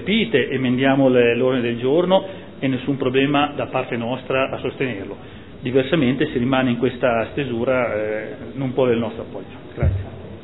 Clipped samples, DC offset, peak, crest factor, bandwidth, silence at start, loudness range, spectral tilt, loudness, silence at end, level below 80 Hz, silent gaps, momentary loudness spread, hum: under 0.1%; 0.5%; -2 dBFS; 18 dB; 4.1 kHz; 0 s; 4 LU; -10.5 dB/octave; -20 LUFS; 0 s; -40 dBFS; none; 14 LU; none